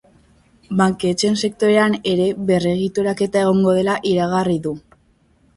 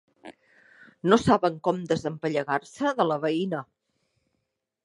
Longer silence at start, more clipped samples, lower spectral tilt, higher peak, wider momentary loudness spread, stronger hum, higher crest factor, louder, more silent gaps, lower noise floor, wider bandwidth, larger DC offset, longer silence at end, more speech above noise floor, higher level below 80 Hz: first, 0.7 s vs 0.25 s; neither; about the same, -5.5 dB/octave vs -6 dB/octave; about the same, -2 dBFS vs -2 dBFS; second, 5 LU vs 9 LU; neither; second, 16 dB vs 24 dB; first, -18 LUFS vs -26 LUFS; neither; second, -57 dBFS vs -79 dBFS; about the same, 11.5 kHz vs 11.5 kHz; neither; second, 0.75 s vs 1.2 s; second, 40 dB vs 55 dB; first, -52 dBFS vs -58 dBFS